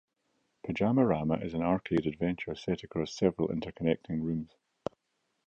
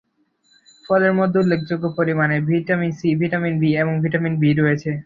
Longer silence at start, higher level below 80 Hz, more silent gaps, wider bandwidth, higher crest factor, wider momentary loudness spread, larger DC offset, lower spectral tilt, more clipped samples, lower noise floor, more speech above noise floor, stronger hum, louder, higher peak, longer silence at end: second, 0.65 s vs 0.9 s; about the same, -56 dBFS vs -58 dBFS; neither; about the same, 7.6 kHz vs 7.4 kHz; about the same, 20 dB vs 16 dB; first, 15 LU vs 4 LU; neither; about the same, -7.5 dB/octave vs -8.5 dB/octave; neither; first, -80 dBFS vs -62 dBFS; first, 49 dB vs 44 dB; neither; second, -31 LUFS vs -19 LUFS; second, -12 dBFS vs -4 dBFS; first, 1 s vs 0.05 s